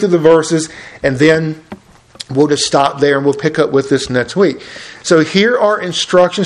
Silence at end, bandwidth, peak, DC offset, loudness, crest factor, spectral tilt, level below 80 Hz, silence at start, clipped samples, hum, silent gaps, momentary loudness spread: 0 s; 11 kHz; 0 dBFS; under 0.1%; -13 LUFS; 12 dB; -4.5 dB/octave; -48 dBFS; 0 s; 0.2%; none; none; 13 LU